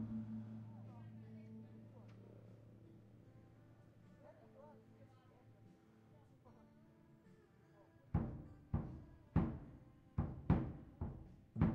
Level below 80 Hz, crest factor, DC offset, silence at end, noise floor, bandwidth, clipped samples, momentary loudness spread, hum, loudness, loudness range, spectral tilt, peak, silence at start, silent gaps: -58 dBFS; 24 dB; under 0.1%; 0 s; -68 dBFS; 5 kHz; under 0.1%; 26 LU; none; -46 LUFS; 21 LU; -10 dB/octave; -22 dBFS; 0 s; none